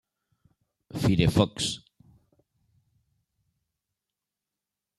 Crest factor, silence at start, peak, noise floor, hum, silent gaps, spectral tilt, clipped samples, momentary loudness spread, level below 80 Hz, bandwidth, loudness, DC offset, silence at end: 24 dB; 0.95 s; -6 dBFS; -88 dBFS; none; none; -5.5 dB/octave; under 0.1%; 16 LU; -50 dBFS; 13.5 kHz; -25 LUFS; under 0.1%; 3.2 s